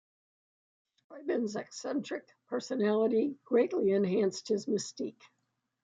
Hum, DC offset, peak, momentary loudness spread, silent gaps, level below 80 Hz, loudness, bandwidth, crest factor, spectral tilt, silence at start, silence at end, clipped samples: none; under 0.1%; -16 dBFS; 13 LU; none; -80 dBFS; -32 LUFS; 9.4 kHz; 16 dB; -5.5 dB/octave; 1.1 s; 0.7 s; under 0.1%